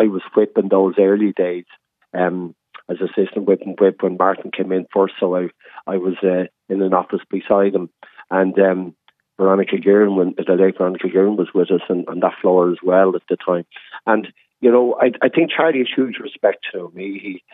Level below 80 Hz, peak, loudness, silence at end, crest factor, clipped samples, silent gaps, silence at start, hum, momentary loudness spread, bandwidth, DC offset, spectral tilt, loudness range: -72 dBFS; -2 dBFS; -18 LUFS; 0.15 s; 16 dB; under 0.1%; none; 0 s; none; 13 LU; 3.9 kHz; under 0.1%; -10.5 dB/octave; 3 LU